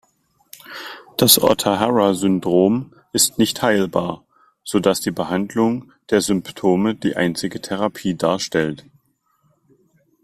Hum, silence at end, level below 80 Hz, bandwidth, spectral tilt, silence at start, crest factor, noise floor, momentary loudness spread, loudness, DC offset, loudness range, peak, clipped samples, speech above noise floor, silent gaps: none; 1.5 s; -54 dBFS; 16 kHz; -4 dB/octave; 0.7 s; 20 dB; -64 dBFS; 13 LU; -19 LUFS; under 0.1%; 5 LU; 0 dBFS; under 0.1%; 46 dB; none